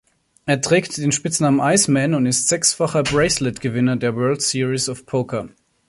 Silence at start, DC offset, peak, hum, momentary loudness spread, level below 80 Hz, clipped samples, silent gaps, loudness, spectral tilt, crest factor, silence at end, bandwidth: 0.45 s; under 0.1%; -2 dBFS; none; 8 LU; -50 dBFS; under 0.1%; none; -18 LUFS; -4 dB/octave; 18 dB; 0.4 s; 11.5 kHz